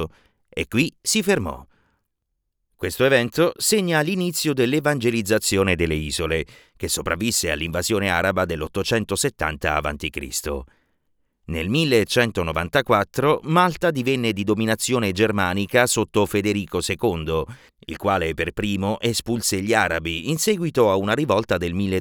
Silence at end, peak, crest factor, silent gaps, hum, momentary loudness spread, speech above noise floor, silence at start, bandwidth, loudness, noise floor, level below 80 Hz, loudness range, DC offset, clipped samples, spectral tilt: 0 s; -2 dBFS; 18 dB; none; none; 8 LU; 55 dB; 0 s; over 20 kHz; -21 LUFS; -77 dBFS; -42 dBFS; 3 LU; under 0.1%; under 0.1%; -4 dB/octave